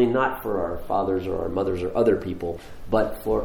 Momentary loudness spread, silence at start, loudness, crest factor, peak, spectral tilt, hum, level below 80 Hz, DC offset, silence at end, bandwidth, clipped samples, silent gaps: 9 LU; 0 s; -25 LUFS; 16 dB; -8 dBFS; -7.5 dB/octave; none; -42 dBFS; under 0.1%; 0 s; over 20 kHz; under 0.1%; none